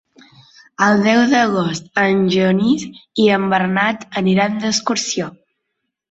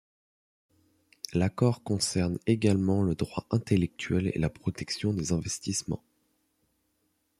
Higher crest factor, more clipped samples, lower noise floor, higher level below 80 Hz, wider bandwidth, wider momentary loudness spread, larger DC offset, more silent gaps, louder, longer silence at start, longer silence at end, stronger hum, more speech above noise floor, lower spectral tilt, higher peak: about the same, 16 dB vs 20 dB; neither; about the same, -75 dBFS vs -75 dBFS; about the same, -58 dBFS vs -56 dBFS; second, 8 kHz vs 14 kHz; about the same, 7 LU vs 7 LU; neither; neither; first, -16 LUFS vs -29 LUFS; second, 0.8 s vs 1.3 s; second, 0.8 s vs 1.45 s; neither; first, 60 dB vs 47 dB; about the same, -4.5 dB/octave vs -5.5 dB/octave; first, -2 dBFS vs -10 dBFS